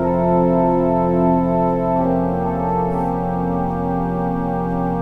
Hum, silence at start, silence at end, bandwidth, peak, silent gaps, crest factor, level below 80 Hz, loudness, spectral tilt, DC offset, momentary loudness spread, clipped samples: none; 0 s; 0 s; 3.8 kHz; -4 dBFS; none; 12 dB; -36 dBFS; -18 LUFS; -11 dB/octave; under 0.1%; 5 LU; under 0.1%